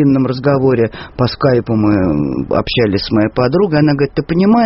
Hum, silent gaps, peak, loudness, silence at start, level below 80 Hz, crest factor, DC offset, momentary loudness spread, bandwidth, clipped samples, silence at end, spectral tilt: none; none; 0 dBFS; -14 LUFS; 0 s; -36 dBFS; 12 dB; under 0.1%; 4 LU; 6 kHz; under 0.1%; 0 s; -6 dB/octave